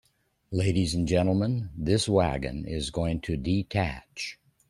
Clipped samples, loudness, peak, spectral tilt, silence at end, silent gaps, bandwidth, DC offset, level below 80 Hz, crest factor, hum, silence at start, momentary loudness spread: under 0.1%; -28 LUFS; -8 dBFS; -6 dB/octave; 0.35 s; none; 12 kHz; under 0.1%; -44 dBFS; 18 dB; none; 0.5 s; 10 LU